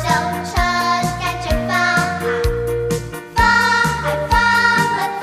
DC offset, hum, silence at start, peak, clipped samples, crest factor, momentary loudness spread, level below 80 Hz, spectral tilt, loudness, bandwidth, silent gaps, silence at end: under 0.1%; none; 0 s; -2 dBFS; under 0.1%; 14 dB; 8 LU; -30 dBFS; -4 dB/octave; -17 LUFS; 16 kHz; none; 0 s